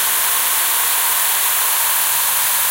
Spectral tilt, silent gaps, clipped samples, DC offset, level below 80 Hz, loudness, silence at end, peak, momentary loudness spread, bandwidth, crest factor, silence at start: 3 dB/octave; none; under 0.1%; under 0.1%; -56 dBFS; -13 LUFS; 0 s; -2 dBFS; 0 LU; 16.5 kHz; 14 dB; 0 s